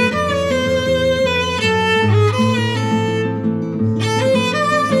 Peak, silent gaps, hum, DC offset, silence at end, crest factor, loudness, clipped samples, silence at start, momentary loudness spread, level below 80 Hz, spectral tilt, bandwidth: -4 dBFS; none; none; under 0.1%; 0 s; 12 dB; -16 LUFS; under 0.1%; 0 s; 5 LU; -42 dBFS; -5.5 dB/octave; 13 kHz